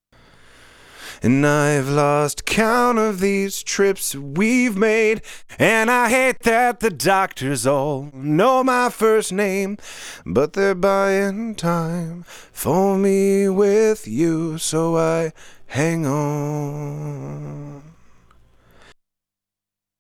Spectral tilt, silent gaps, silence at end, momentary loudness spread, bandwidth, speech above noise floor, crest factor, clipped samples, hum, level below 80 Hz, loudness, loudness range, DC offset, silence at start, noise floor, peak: -5 dB/octave; none; 2.25 s; 13 LU; 17.5 kHz; 69 dB; 16 dB; under 0.1%; none; -50 dBFS; -19 LUFS; 8 LU; under 0.1%; 0.95 s; -87 dBFS; -4 dBFS